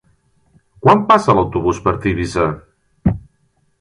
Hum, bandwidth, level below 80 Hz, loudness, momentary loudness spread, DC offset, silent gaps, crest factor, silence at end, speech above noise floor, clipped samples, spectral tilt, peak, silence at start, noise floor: none; 11.5 kHz; -36 dBFS; -16 LUFS; 9 LU; under 0.1%; none; 18 dB; 0.6 s; 47 dB; under 0.1%; -7 dB/octave; 0 dBFS; 0.85 s; -61 dBFS